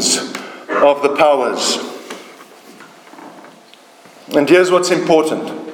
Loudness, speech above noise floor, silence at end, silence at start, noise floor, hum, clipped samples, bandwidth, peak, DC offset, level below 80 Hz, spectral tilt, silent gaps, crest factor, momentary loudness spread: -14 LUFS; 31 dB; 0 s; 0 s; -44 dBFS; none; under 0.1%; 18.5 kHz; 0 dBFS; under 0.1%; -62 dBFS; -3 dB/octave; none; 16 dB; 17 LU